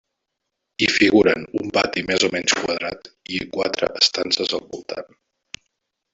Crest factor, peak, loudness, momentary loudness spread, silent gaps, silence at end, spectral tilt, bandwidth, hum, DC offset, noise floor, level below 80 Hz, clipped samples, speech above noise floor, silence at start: 20 dB; -2 dBFS; -20 LUFS; 22 LU; none; 1.1 s; -3 dB/octave; 8 kHz; none; under 0.1%; -79 dBFS; -56 dBFS; under 0.1%; 58 dB; 0.8 s